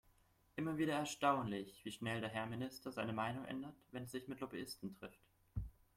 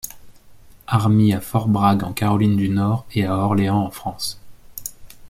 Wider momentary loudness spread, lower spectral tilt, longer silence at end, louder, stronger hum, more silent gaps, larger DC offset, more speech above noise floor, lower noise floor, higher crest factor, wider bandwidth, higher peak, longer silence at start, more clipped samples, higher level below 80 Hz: about the same, 14 LU vs 16 LU; second, -5 dB/octave vs -6.5 dB/octave; first, 0.25 s vs 0 s; second, -44 LUFS vs -19 LUFS; neither; neither; neither; about the same, 30 dB vs 27 dB; first, -73 dBFS vs -45 dBFS; first, 22 dB vs 16 dB; about the same, 16.5 kHz vs 16.5 kHz; second, -22 dBFS vs -4 dBFS; first, 0.55 s vs 0.05 s; neither; second, -62 dBFS vs -48 dBFS